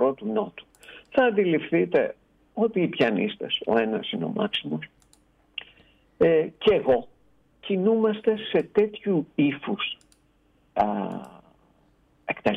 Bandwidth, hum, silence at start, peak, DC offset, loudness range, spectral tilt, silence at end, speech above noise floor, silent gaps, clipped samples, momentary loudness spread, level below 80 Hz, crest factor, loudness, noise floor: 7.8 kHz; none; 0 s; -10 dBFS; under 0.1%; 4 LU; -7.5 dB/octave; 0 s; 39 dB; none; under 0.1%; 17 LU; -62 dBFS; 16 dB; -25 LUFS; -63 dBFS